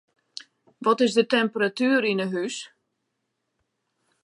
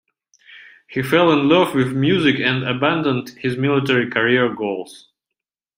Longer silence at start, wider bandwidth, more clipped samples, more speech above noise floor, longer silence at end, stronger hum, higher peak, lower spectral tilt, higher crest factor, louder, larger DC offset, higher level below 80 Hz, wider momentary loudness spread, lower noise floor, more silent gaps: first, 0.8 s vs 0.5 s; second, 11.5 kHz vs 16 kHz; neither; second, 55 dB vs 67 dB; first, 1.55 s vs 0.8 s; neither; second, -8 dBFS vs -2 dBFS; second, -4.5 dB/octave vs -6.5 dB/octave; about the same, 18 dB vs 18 dB; second, -23 LUFS vs -18 LUFS; neither; second, -80 dBFS vs -58 dBFS; first, 21 LU vs 11 LU; second, -78 dBFS vs -84 dBFS; neither